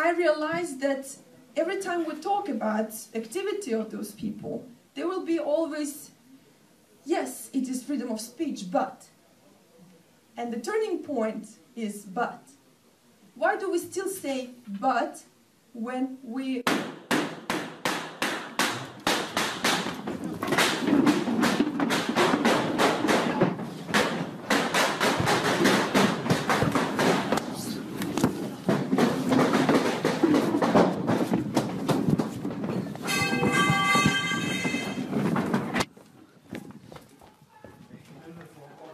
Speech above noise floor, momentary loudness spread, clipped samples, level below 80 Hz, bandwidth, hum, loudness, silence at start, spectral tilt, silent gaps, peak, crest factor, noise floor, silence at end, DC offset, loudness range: 30 dB; 13 LU; under 0.1%; -62 dBFS; 14.5 kHz; none; -27 LUFS; 0 s; -4.5 dB/octave; none; -10 dBFS; 18 dB; -60 dBFS; 0 s; under 0.1%; 9 LU